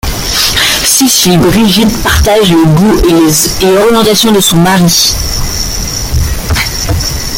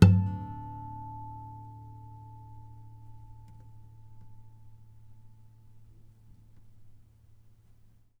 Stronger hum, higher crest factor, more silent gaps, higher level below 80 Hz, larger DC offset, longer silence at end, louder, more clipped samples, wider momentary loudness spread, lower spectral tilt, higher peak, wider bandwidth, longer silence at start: neither; second, 8 dB vs 30 dB; neither; first, -20 dBFS vs -52 dBFS; neither; second, 0 s vs 1.25 s; first, -7 LUFS vs -33 LUFS; first, 0.2% vs under 0.1%; second, 8 LU vs 20 LU; second, -3.5 dB/octave vs -8 dB/octave; about the same, 0 dBFS vs -2 dBFS; first, over 20 kHz vs 7 kHz; about the same, 0.05 s vs 0 s